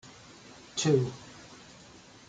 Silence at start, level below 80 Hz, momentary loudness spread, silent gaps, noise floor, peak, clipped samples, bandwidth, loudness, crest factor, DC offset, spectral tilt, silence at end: 0.05 s; -66 dBFS; 24 LU; none; -53 dBFS; -12 dBFS; under 0.1%; 9.4 kHz; -29 LUFS; 20 dB; under 0.1%; -5 dB/octave; 0.7 s